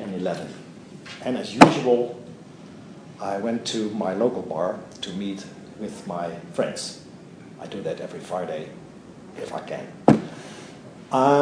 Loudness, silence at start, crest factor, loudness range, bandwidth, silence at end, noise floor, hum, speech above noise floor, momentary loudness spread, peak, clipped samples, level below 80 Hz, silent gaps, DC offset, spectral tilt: -24 LUFS; 0 s; 26 dB; 10 LU; 11 kHz; 0 s; -43 dBFS; none; 20 dB; 23 LU; 0 dBFS; under 0.1%; -60 dBFS; none; under 0.1%; -5.5 dB/octave